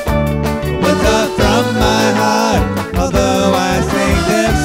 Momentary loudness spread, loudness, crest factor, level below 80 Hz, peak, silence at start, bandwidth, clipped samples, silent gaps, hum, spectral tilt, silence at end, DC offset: 4 LU; -13 LUFS; 12 dB; -24 dBFS; 0 dBFS; 0 s; 16.5 kHz; under 0.1%; none; none; -5 dB/octave; 0 s; under 0.1%